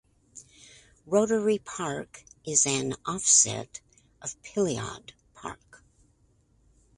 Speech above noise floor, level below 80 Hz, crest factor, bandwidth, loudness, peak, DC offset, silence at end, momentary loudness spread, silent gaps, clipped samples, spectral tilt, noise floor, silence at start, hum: 38 dB; -62 dBFS; 24 dB; 11.5 kHz; -25 LUFS; -8 dBFS; under 0.1%; 1.45 s; 24 LU; none; under 0.1%; -2.5 dB/octave; -65 dBFS; 0.35 s; none